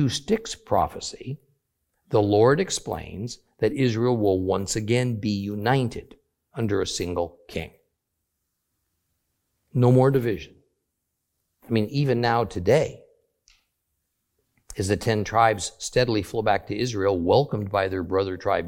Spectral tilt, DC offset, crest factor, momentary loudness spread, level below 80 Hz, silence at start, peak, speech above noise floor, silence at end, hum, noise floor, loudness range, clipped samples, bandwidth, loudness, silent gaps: -5.5 dB/octave; under 0.1%; 20 dB; 14 LU; -52 dBFS; 0 s; -4 dBFS; 56 dB; 0 s; none; -79 dBFS; 5 LU; under 0.1%; 16.5 kHz; -24 LUFS; none